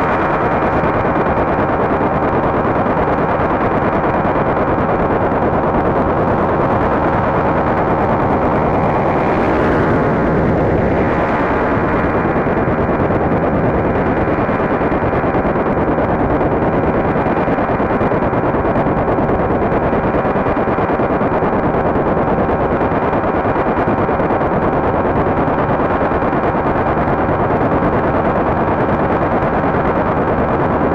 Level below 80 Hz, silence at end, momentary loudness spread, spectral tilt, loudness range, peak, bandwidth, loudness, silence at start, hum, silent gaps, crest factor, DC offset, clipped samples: -30 dBFS; 0 s; 1 LU; -9.5 dB/octave; 1 LU; -4 dBFS; 7.6 kHz; -15 LUFS; 0 s; none; none; 10 dB; under 0.1%; under 0.1%